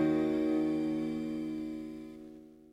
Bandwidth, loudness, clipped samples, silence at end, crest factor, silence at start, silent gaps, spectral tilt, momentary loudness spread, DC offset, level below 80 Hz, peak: 9 kHz; -33 LUFS; under 0.1%; 0.1 s; 14 dB; 0 s; none; -7.5 dB/octave; 19 LU; under 0.1%; -64 dBFS; -20 dBFS